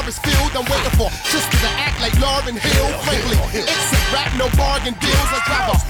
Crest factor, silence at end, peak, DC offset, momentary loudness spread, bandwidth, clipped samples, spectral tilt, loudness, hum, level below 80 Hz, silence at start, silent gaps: 10 dB; 0 s; -6 dBFS; under 0.1%; 3 LU; over 20 kHz; under 0.1%; -3.5 dB/octave; -17 LUFS; none; -22 dBFS; 0 s; none